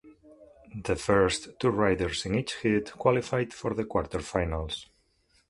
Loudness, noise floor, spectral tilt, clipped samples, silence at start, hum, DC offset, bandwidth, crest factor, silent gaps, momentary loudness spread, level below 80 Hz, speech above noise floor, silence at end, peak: -28 LUFS; -68 dBFS; -5.5 dB/octave; under 0.1%; 0.05 s; none; under 0.1%; 11.5 kHz; 22 dB; none; 9 LU; -46 dBFS; 40 dB; 0.65 s; -8 dBFS